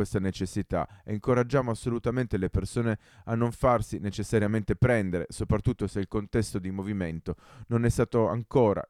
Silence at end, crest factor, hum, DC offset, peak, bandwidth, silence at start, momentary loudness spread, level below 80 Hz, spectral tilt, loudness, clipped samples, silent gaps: 0.05 s; 18 dB; none; under 0.1%; -10 dBFS; 13.5 kHz; 0 s; 8 LU; -44 dBFS; -7 dB/octave; -28 LUFS; under 0.1%; none